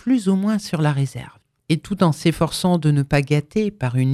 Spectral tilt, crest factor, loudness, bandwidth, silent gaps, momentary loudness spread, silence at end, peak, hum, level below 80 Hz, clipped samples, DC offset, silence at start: -6.5 dB/octave; 18 dB; -20 LUFS; 14 kHz; none; 6 LU; 0 s; -2 dBFS; none; -46 dBFS; under 0.1%; under 0.1%; 0.05 s